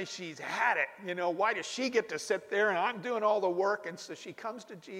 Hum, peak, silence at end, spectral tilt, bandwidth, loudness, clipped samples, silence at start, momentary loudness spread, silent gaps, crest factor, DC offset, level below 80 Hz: none; -14 dBFS; 0 s; -3.5 dB/octave; 15.5 kHz; -32 LUFS; under 0.1%; 0 s; 13 LU; none; 18 dB; under 0.1%; -84 dBFS